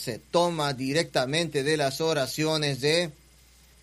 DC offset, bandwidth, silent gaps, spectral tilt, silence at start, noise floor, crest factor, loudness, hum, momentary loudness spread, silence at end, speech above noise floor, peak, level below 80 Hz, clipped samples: under 0.1%; 15.5 kHz; none; -4 dB/octave; 0 s; -56 dBFS; 18 dB; -26 LUFS; none; 3 LU; 0.7 s; 30 dB; -10 dBFS; -60 dBFS; under 0.1%